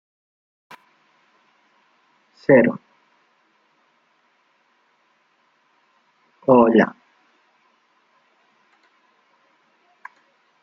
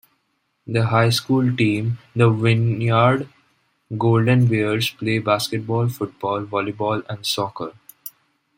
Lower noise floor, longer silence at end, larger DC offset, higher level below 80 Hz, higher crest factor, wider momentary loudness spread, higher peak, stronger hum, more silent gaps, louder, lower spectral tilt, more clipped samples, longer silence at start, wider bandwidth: second, -64 dBFS vs -70 dBFS; first, 3.75 s vs 0.5 s; neither; second, -68 dBFS vs -58 dBFS; first, 24 dB vs 18 dB; first, 31 LU vs 15 LU; about the same, -2 dBFS vs -2 dBFS; neither; neither; first, -17 LUFS vs -20 LUFS; first, -9 dB/octave vs -6 dB/octave; neither; first, 2.5 s vs 0.65 s; second, 6.2 kHz vs 16.5 kHz